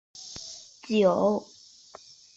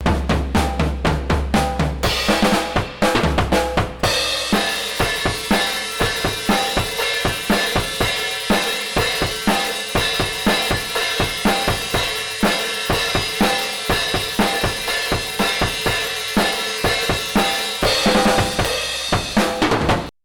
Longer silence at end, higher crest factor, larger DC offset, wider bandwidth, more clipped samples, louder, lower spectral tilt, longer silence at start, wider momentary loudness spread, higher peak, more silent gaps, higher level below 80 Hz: first, 0.95 s vs 0.15 s; first, 18 dB vs 12 dB; neither; second, 8 kHz vs 19 kHz; neither; second, -25 LUFS vs -19 LUFS; first, -5.5 dB/octave vs -3.5 dB/octave; first, 0.15 s vs 0 s; first, 26 LU vs 3 LU; about the same, -10 dBFS vs -8 dBFS; neither; second, -68 dBFS vs -30 dBFS